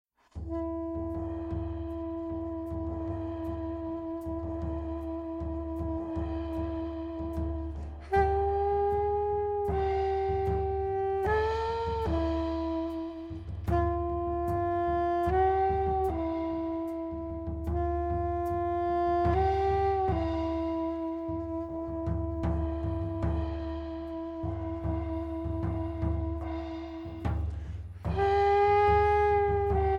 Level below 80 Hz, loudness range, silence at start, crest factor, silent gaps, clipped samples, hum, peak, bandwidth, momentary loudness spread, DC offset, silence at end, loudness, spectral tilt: -38 dBFS; 7 LU; 0.35 s; 16 dB; none; under 0.1%; none; -14 dBFS; 7 kHz; 10 LU; under 0.1%; 0 s; -31 LUFS; -9 dB/octave